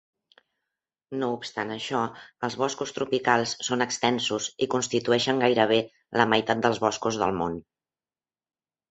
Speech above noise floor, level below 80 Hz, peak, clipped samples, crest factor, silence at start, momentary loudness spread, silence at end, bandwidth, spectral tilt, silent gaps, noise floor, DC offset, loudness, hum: over 64 dB; -62 dBFS; -2 dBFS; under 0.1%; 24 dB; 1.1 s; 9 LU; 1.3 s; 8.2 kHz; -3.5 dB/octave; none; under -90 dBFS; under 0.1%; -26 LUFS; none